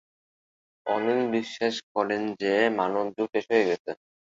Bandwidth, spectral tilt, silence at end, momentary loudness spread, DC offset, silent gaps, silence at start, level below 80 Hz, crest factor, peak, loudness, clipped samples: 7.8 kHz; -5 dB/octave; 0.3 s; 6 LU; under 0.1%; 1.83-1.95 s, 3.79-3.85 s; 0.85 s; -72 dBFS; 18 dB; -8 dBFS; -26 LUFS; under 0.1%